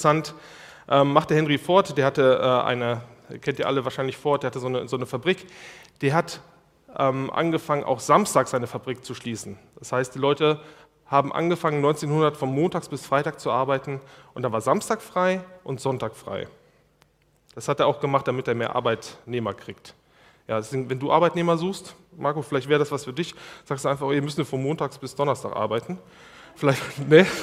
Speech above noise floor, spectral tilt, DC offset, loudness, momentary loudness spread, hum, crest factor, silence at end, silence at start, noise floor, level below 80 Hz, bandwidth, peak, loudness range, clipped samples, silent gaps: 38 dB; -5.5 dB/octave; under 0.1%; -24 LUFS; 15 LU; none; 24 dB; 0 s; 0 s; -62 dBFS; -64 dBFS; 15.5 kHz; 0 dBFS; 5 LU; under 0.1%; none